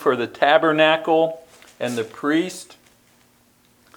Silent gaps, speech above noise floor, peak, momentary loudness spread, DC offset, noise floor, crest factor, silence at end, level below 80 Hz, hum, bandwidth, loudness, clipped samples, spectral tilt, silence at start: none; 38 dB; 0 dBFS; 14 LU; under 0.1%; -58 dBFS; 22 dB; 1.35 s; -70 dBFS; none; 19 kHz; -19 LUFS; under 0.1%; -4.5 dB/octave; 0 s